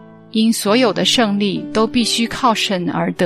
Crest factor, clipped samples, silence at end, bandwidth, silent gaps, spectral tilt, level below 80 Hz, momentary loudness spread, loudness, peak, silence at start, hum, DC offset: 14 dB; under 0.1%; 0 s; 15 kHz; none; -4 dB/octave; -48 dBFS; 5 LU; -16 LUFS; -2 dBFS; 0 s; none; under 0.1%